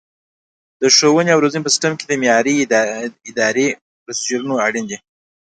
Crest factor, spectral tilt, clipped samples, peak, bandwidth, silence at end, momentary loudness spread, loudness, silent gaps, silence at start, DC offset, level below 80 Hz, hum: 18 dB; -3 dB/octave; under 0.1%; 0 dBFS; 11 kHz; 0.65 s; 14 LU; -15 LUFS; 3.81-4.06 s; 0.8 s; under 0.1%; -66 dBFS; none